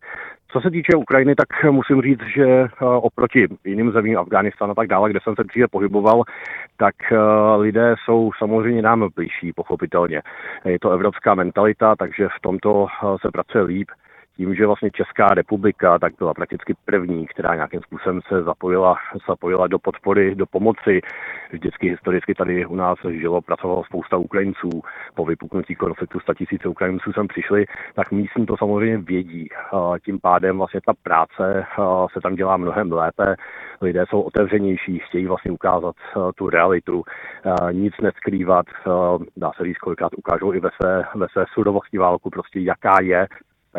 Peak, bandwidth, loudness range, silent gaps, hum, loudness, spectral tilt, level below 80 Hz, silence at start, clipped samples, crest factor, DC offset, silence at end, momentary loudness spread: 0 dBFS; 5 kHz; 5 LU; none; none; -19 LUFS; -9.5 dB/octave; -52 dBFS; 0.05 s; under 0.1%; 18 dB; under 0.1%; 0 s; 10 LU